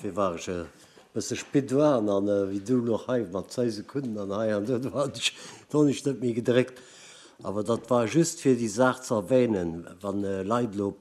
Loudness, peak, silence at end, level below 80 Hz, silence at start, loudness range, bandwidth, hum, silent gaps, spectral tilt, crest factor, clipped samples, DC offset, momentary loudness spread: -27 LUFS; -8 dBFS; 0.05 s; -64 dBFS; 0 s; 2 LU; 14 kHz; none; none; -5.5 dB/octave; 20 dB; under 0.1%; under 0.1%; 11 LU